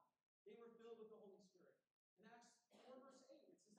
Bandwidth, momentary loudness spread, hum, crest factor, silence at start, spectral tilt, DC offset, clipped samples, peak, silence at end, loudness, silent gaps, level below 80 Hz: 9.6 kHz; 6 LU; none; 18 dB; 0 s; -4.5 dB/octave; under 0.1%; under 0.1%; -50 dBFS; 0 s; -65 LUFS; 0.23-0.46 s, 1.91-2.17 s; under -90 dBFS